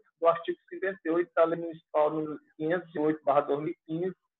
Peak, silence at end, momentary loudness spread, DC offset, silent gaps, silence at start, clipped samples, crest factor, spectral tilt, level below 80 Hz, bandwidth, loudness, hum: -10 dBFS; 0.25 s; 9 LU; under 0.1%; none; 0.2 s; under 0.1%; 20 dB; -9.5 dB/octave; -82 dBFS; 4.1 kHz; -30 LUFS; none